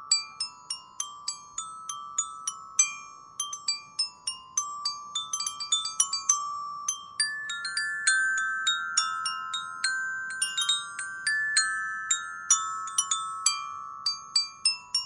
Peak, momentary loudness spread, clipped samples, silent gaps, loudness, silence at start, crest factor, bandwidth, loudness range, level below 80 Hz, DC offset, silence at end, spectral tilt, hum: -6 dBFS; 11 LU; under 0.1%; none; -28 LUFS; 0 s; 24 dB; 11.5 kHz; 4 LU; -78 dBFS; under 0.1%; 0 s; 4 dB/octave; none